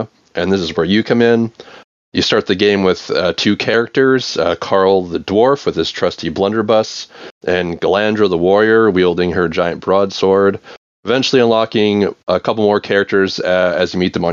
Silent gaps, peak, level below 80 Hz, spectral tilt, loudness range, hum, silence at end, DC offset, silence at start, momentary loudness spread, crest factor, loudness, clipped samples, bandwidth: 1.84-2.12 s, 7.31-7.41 s, 10.77-11.03 s; 0 dBFS; -54 dBFS; -5.5 dB/octave; 2 LU; none; 0 s; under 0.1%; 0 s; 6 LU; 14 dB; -14 LUFS; under 0.1%; 7.4 kHz